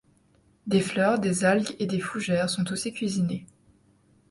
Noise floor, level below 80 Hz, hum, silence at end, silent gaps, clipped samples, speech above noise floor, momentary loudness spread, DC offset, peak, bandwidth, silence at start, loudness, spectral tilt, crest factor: -63 dBFS; -62 dBFS; none; 0.85 s; none; under 0.1%; 37 dB; 6 LU; under 0.1%; -8 dBFS; 11.5 kHz; 0.65 s; -26 LUFS; -5 dB/octave; 18 dB